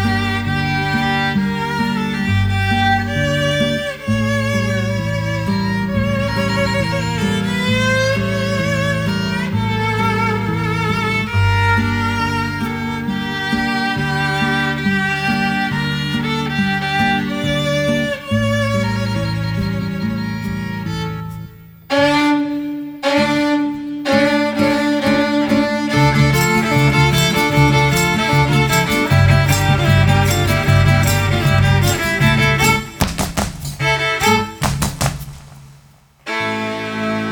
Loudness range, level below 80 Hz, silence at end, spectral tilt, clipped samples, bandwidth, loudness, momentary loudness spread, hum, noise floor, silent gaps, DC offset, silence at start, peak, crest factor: 6 LU; -34 dBFS; 0 s; -5 dB/octave; under 0.1%; over 20 kHz; -16 LUFS; 8 LU; none; -48 dBFS; none; under 0.1%; 0 s; 0 dBFS; 16 dB